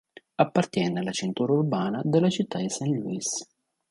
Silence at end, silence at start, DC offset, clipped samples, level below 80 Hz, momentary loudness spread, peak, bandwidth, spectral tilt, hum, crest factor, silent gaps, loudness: 0.45 s; 0.4 s; under 0.1%; under 0.1%; -68 dBFS; 6 LU; -6 dBFS; 11.5 kHz; -5.5 dB/octave; none; 20 dB; none; -26 LUFS